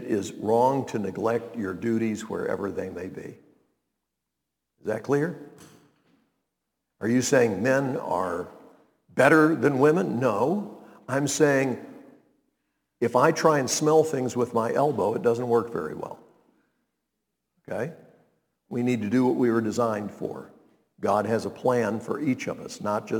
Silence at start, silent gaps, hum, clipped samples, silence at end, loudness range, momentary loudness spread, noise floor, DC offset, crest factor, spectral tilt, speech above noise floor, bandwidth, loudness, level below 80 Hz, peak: 0 s; none; none; under 0.1%; 0 s; 11 LU; 15 LU; -83 dBFS; under 0.1%; 22 dB; -5.5 dB/octave; 59 dB; 19 kHz; -25 LUFS; -70 dBFS; -4 dBFS